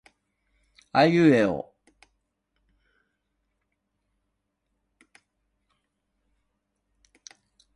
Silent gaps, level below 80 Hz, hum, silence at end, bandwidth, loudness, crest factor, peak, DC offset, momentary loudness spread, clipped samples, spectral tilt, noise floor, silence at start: none; -66 dBFS; none; 6.15 s; 10.5 kHz; -21 LUFS; 24 dB; -6 dBFS; under 0.1%; 17 LU; under 0.1%; -7 dB/octave; -79 dBFS; 0.95 s